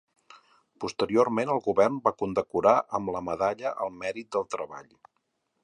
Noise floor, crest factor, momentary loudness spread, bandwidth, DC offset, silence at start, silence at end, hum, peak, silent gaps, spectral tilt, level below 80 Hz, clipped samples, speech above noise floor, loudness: -77 dBFS; 22 dB; 12 LU; 10.5 kHz; under 0.1%; 0.8 s; 0.8 s; none; -6 dBFS; none; -6 dB/octave; -62 dBFS; under 0.1%; 50 dB; -27 LUFS